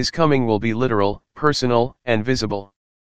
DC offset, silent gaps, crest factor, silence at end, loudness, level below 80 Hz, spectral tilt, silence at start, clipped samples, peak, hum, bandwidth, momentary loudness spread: 2%; none; 18 dB; 0.3 s; -20 LUFS; -46 dBFS; -5.5 dB/octave; 0 s; under 0.1%; -2 dBFS; none; 9.6 kHz; 5 LU